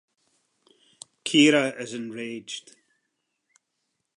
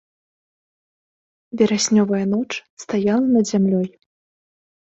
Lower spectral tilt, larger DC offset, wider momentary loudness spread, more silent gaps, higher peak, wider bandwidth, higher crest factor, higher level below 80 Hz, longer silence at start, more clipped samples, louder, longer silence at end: second, -3.5 dB/octave vs -5 dB/octave; neither; first, 18 LU vs 12 LU; second, none vs 2.70-2.77 s; about the same, -6 dBFS vs -4 dBFS; first, 11 kHz vs 8.2 kHz; about the same, 22 dB vs 18 dB; second, -84 dBFS vs -62 dBFS; second, 1.25 s vs 1.55 s; neither; second, -23 LUFS vs -19 LUFS; first, 1.55 s vs 0.95 s